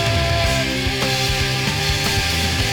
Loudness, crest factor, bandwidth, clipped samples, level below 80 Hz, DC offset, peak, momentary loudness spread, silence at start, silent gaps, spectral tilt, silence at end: -18 LUFS; 14 dB; over 20 kHz; under 0.1%; -28 dBFS; under 0.1%; -6 dBFS; 1 LU; 0 s; none; -3.5 dB/octave; 0 s